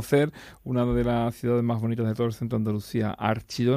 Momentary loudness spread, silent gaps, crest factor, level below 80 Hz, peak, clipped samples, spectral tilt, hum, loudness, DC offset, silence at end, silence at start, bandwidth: 5 LU; none; 16 dB; -46 dBFS; -10 dBFS; under 0.1%; -7.5 dB/octave; none; -26 LUFS; under 0.1%; 0 s; 0 s; 15.5 kHz